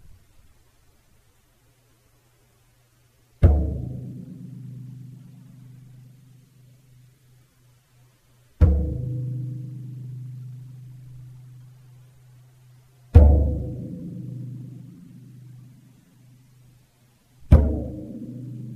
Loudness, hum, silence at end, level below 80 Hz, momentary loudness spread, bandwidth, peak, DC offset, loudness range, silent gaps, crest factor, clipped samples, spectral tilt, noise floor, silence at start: -23 LUFS; none; 0 s; -28 dBFS; 28 LU; 3.2 kHz; 0 dBFS; under 0.1%; 19 LU; none; 26 dB; under 0.1%; -10 dB/octave; -60 dBFS; 3.4 s